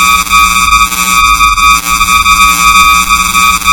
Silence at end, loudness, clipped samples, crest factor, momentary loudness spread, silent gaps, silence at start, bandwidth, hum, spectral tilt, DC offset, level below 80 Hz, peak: 0 s; -5 LUFS; 0.2%; 6 dB; 3 LU; none; 0 s; 17.5 kHz; none; 0 dB/octave; under 0.1%; -22 dBFS; 0 dBFS